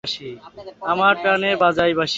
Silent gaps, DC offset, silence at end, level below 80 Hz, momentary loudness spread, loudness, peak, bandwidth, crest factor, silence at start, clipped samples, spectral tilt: none; under 0.1%; 0 s; -54 dBFS; 16 LU; -18 LUFS; -2 dBFS; 8 kHz; 16 dB; 0.05 s; under 0.1%; -4.5 dB/octave